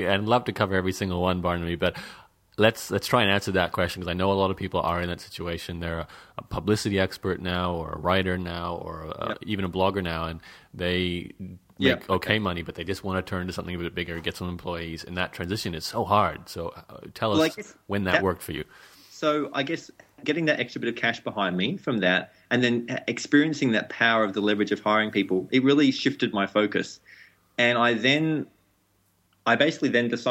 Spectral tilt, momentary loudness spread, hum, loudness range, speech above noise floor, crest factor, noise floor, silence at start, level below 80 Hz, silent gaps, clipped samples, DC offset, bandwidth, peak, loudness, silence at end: -5.5 dB/octave; 13 LU; none; 6 LU; 41 dB; 22 dB; -67 dBFS; 0 s; -52 dBFS; none; under 0.1%; under 0.1%; 16 kHz; -4 dBFS; -26 LUFS; 0 s